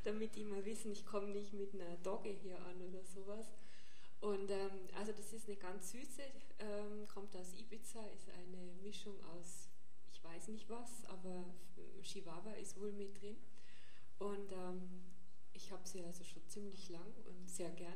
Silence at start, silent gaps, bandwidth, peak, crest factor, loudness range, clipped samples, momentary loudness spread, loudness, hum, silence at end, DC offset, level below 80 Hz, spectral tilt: 0 s; none; 13 kHz; -30 dBFS; 20 dB; 6 LU; under 0.1%; 14 LU; -51 LUFS; none; 0 s; 1%; -80 dBFS; -4.5 dB/octave